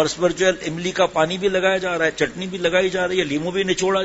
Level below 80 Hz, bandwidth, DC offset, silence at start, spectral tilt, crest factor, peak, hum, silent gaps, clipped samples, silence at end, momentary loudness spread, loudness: -50 dBFS; 8 kHz; under 0.1%; 0 s; -4 dB/octave; 18 dB; -2 dBFS; none; none; under 0.1%; 0 s; 5 LU; -20 LUFS